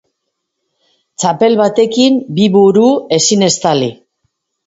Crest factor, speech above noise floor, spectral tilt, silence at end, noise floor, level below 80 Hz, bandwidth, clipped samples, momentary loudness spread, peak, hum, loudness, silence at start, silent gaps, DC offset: 12 dB; 62 dB; -4.5 dB/octave; 0.75 s; -72 dBFS; -56 dBFS; 8 kHz; under 0.1%; 8 LU; 0 dBFS; none; -11 LUFS; 1.2 s; none; under 0.1%